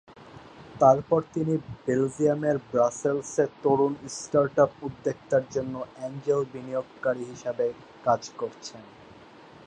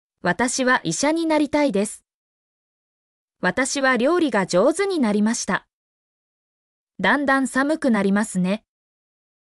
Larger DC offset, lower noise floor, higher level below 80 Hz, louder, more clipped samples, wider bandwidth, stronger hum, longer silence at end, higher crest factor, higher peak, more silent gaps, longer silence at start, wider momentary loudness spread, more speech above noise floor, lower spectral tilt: neither; second, -50 dBFS vs under -90 dBFS; about the same, -62 dBFS vs -60 dBFS; second, -27 LUFS vs -20 LUFS; neither; second, 10.5 kHz vs 12 kHz; neither; second, 0.65 s vs 0.85 s; first, 22 dB vs 14 dB; about the same, -6 dBFS vs -8 dBFS; second, none vs 2.14-3.28 s, 5.73-6.87 s; second, 0.1 s vs 0.25 s; first, 13 LU vs 7 LU; second, 24 dB vs over 70 dB; first, -6 dB/octave vs -4.5 dB/octave